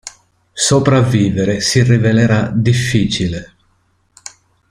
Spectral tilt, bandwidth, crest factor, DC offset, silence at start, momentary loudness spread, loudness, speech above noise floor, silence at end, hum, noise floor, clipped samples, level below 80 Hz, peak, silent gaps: -5 dB/octave; 12.5 kHz; 14 dB; under 0.1%; 0.05 s; 22 LU; -13 LUFS; 46 dB; 1.25 s; none; -59 dBFS; under 0.1%; -42 dBFS; -2 dBFS; none